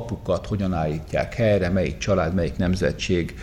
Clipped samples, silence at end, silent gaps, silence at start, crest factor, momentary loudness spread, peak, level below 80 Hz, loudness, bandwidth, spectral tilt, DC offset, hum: under 0.1%; 0 s; none; 0 s; 14 dB; 5 LU; -8 dBFS; -38 dBFS; -23 LUFS; 12.5 kHz; -6.5 dB/octave; under 0.1%; none